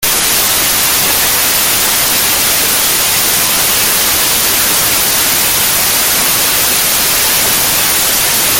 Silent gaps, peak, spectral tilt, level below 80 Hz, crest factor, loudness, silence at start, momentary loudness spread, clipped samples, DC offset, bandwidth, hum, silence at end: none; 0 dBFS; 0 dB/octave; -36 dBFS; 10 dB; -8 LUFS; 0 s; 0 LU; under 0.1%; under 0.1%; over 20 kHz; none; 0 s